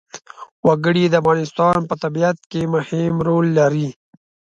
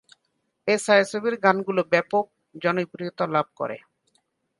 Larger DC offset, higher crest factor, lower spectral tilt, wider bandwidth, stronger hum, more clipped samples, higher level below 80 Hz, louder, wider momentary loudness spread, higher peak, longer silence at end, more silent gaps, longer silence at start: neither; second, 16 dB vs 22 dB; first, -7 dB/octave vs -4.5 dB/octave; second, 7.8 kHz vs 11.5 kHz; neither; neither; first, -54 dBFS vs -74 dBFS; first, -18 LUFS vs -24 LUFS; second, 8 LU vs 13 LU; about the same, -2 dBFS vs -2 dBFS; second, 0.65 s vs 0.8 s; first, 0.51-0.63 s, 2.46-2.50 s vs none; second, 0.15 s vs 0.65 s